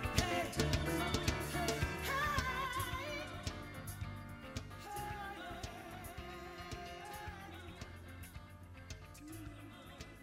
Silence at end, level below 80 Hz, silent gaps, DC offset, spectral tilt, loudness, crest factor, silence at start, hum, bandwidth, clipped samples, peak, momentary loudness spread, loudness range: 0 s; -50 dBFS; none; under 0.1%; -4 dB/octave; -41 LUFS; 26 dB; 0 s; none; 16 kHz; under 0.1%; -16 dBFS; 16 LU; 12 LU